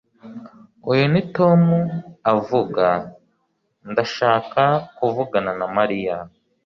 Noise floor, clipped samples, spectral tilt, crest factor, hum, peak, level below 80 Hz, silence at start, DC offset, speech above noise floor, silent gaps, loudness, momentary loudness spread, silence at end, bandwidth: -69 dBFS; under 0.1%; -8 dB/octave; 18 dB; none; -4 dBFS; -58 dBFS; 0.25 s; under 0.1%; 50 dB; none; -20 LUFS; 16 LU; 0.4 s; 6.6 kHz